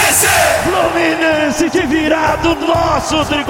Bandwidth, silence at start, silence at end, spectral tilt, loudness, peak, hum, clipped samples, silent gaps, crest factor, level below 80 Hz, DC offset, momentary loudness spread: 17 kHz; 0 s; 0 s; -3 dB/octave; -13 LUFS; 0 dBFS; none; under 0.1%; none; 12 dB; -34 dBFS; 0.1%; 5 LU